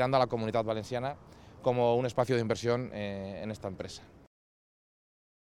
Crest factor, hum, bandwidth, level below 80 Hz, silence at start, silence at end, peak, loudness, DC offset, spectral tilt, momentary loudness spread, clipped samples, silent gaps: 20 dB; none; 13 kHz; -62 dBFS; 0 s; 1.5 s; -12 dBFS; -32 LUFS; under 0.1%; -6.5 dB/octave; 13 LU; under 0.1%; none